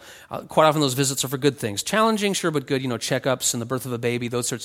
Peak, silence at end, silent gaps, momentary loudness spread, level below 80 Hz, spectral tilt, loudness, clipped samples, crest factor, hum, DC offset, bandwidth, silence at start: -2 dBFS; 0 s; none; 8 LU; -60 dBFS; -4 dB/octave; -22 LUFS; under 0.1%; 20 dB; none; under 0.1%; 17 kHz; 0 s